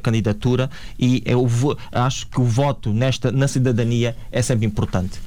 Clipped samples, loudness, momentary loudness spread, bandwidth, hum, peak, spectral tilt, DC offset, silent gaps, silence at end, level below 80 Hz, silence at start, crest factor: under 0.1%; -20 LUFS; 4 LU; 12.5 kHz; none; -8 dBFS; -6.5 dB/octave; 2%; none; 0 s; -38 dBFS; 0 s; 12 dB